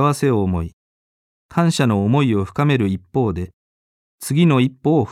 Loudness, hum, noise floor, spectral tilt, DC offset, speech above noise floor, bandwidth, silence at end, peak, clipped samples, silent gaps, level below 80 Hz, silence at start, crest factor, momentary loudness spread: -18 LUFS; none; under -90 dBFS; -7 dB/octave; under 0.1%; over 73 dB; 15 kHz; 0 s; -2 dBFS; under 0.1%; 0.73-1.49 s, 3.53-4.19 s; -44 dBFS; 0 s; 16 dB; 11 LU